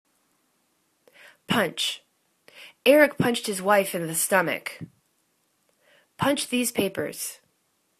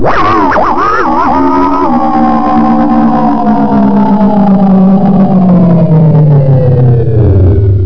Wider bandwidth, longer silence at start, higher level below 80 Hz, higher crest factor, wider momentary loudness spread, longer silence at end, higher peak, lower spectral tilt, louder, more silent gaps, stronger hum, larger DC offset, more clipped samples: first, 14 kHz vs 5.4 kHz; first, 1.5 s vs 0 s; second, -66 dBFS vs -24 dBFS; first, 22 dB vs 6 dB; first, 15 LU vs 3 LU; first, 0.65 s vs 0 s; about the same, -4 dBFS vs -2 dBFS; second, -3.5 dB/octave vs -10 dB/octave; second, -24 LUFS vs -7 LUFS; neither; neither; second, under 0.1% vs 10%; neither